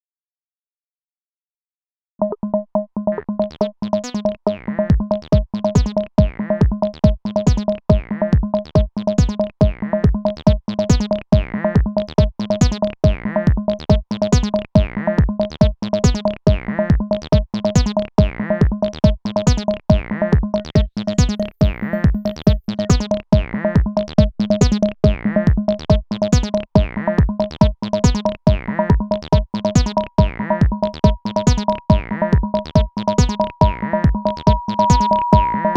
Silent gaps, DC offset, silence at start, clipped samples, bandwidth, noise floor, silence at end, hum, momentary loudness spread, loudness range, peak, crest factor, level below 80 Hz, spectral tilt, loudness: none; under 0.1%; 2.2 s; under 0.1%; 8.6 kHz; under -90 dBFS; 0 s; none; 3 LU; 2 LU; 0 dBFS; 16 dB; -24 dBFS; -7 dB/octave; -18 LUFS